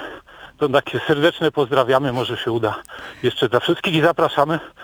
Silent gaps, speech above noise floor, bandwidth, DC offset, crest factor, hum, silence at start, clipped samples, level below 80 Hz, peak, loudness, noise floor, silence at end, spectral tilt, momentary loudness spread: none; 21 dB; over 20 kHz; under 0.1%; 18 dB; none; 0 s; under 0.1%; -54 dBFS; 0 dBFS; -19 LUFS; -40 dBFS; 0 s; -6 dB/octave; 8 LU